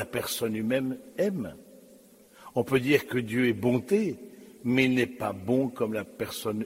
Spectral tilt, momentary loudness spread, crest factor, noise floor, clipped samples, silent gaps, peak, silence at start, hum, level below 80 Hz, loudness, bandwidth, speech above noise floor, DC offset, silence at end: -5.5 dB/octave; 10 LU; 20 dB; -55 dBFS; under 0.1%; none; -8 dBFS; 0 s; none; -64 dBFS; -28 LUFS; 16 kHz; 27 dB; under 0.1%; 0 s